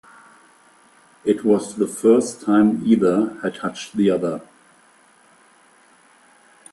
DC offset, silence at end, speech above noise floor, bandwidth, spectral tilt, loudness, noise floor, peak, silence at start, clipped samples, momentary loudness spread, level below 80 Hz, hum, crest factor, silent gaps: under 0.1%; 2.3 s; 35 dB; 12.5 kHz; -6 dB/octave; -19 LUFS; -54 dBFS; -2 dBFS; 1.25 s; under 0.1%; 10 LU; -64 dBFS; none; 20 dB; none